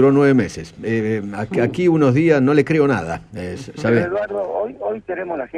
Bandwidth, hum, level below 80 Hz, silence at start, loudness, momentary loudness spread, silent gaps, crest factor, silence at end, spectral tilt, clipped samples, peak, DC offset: 10.5 kHz; none; -50 dBFS; 0 s; -18 LUFS; 13 LU; none; 16 dB; 0 s; -7.5 dB/octave; under 0.1%; -2 dBFS; under 0.1%